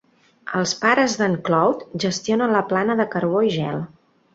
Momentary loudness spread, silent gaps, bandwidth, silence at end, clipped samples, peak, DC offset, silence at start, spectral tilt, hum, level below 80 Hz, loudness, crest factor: 9 LU; none; 8 kHz; 0.5 s; under 0.1%; -2 dBFS; under 0.1%; 0.45 s; -5 dB/octave; none; -62 dBFS; -20 LUFS; 18 dB